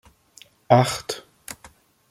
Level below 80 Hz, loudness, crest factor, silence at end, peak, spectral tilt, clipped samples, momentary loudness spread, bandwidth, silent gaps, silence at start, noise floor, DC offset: -58 dBFS; -21 LUFS; 22 dB; 0.55 s; -2 dBFS; -5 dB/octave; under 0.1%; 21 LU; 16 kHz; none; 0.7 s; -53 dBFS; under 0.1%